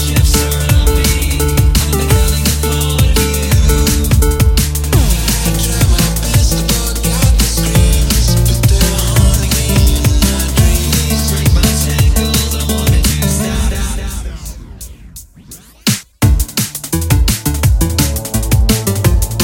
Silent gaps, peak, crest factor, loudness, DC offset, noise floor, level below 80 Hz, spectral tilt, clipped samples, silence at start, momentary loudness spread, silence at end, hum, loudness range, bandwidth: none; 0 dBFS; 12 dB; -13 LUFS; under 0.1%; -36 dBFS; -14 dBFS; -4.5 dB/octave; under 0.1%; 0 s; 5 LU; 0 s; none; 5 LU; 17 kHz